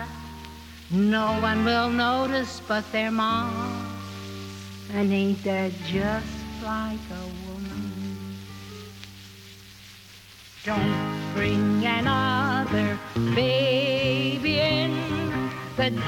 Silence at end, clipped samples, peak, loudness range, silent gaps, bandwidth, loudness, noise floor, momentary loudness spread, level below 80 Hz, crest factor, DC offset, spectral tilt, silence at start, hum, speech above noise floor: 0 s; under 0.1%; -10 dBFS; 11 LU; none; 16.5 kHz; -25 LUFS; -47 dBFS; 19 LU; -50 dBFS; 16 dB; under 0.1%; -6 dB/octave; 0 s; none; 23 dB